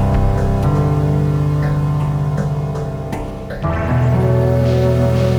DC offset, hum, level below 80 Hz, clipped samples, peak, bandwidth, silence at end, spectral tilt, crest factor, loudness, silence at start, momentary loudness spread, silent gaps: under 0.1%; none; -26 dBFS; under 0.1%; -4 dBFS; 12 kHz; 0 s; -8.5 dB/octave; 12 dB; -17 LUFS; 0 s; 9 LU; none